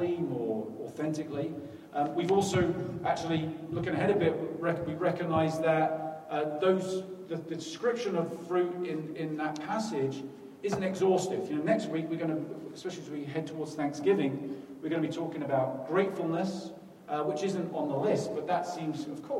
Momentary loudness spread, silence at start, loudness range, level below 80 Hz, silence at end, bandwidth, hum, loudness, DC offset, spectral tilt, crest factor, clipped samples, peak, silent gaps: 11 LU; 0 s; 3 LU; -68 dBFS; 0 s; 14 kHz; none; -32 LUFS; under 0.1%; -6 dB/octave; 18 dB; under 0.1%; -14 dBFS; none